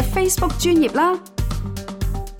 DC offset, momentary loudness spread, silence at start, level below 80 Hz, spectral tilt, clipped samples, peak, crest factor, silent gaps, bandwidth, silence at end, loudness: under 0.1%; 11 LU; 0 s; -28 dBFS; -5 dB/octave; under 0.1%; -8 dBFS; 12 dB; none; 17.5 kHz; 0 s; -20 LUFS